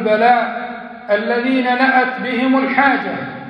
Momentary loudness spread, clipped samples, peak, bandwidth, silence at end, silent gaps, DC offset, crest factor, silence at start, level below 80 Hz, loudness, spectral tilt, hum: 11 LU; under 0.1%; -2 dBFS; 5.4 kHz; 0 s; none; under 0.1%; 14 dB; 0 s; -62 dBFS; -15 LUFS; -7 dB/octave; none